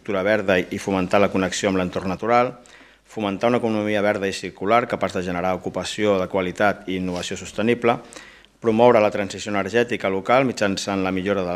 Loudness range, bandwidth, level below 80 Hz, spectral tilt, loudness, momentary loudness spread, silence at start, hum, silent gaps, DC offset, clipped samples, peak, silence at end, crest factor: 3 LU; 14.5 kHz; -58 dBFS; -5 dB/octave; -21 LUFS; 8 LU; 0.05 s; none; none; under 0.1%; under 0.1%; -2 dBFS; 0 s; 20 dB